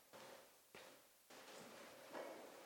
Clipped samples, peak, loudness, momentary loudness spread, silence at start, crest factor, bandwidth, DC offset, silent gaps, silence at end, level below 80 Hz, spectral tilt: under 0.1%; -38 dBFS; -59 LUFS; 10 LU; 0 s; 22 dB; 17.5 kHz; under 0.1%; none; 0 s; under -90 dBFS; -2.5 dB/octave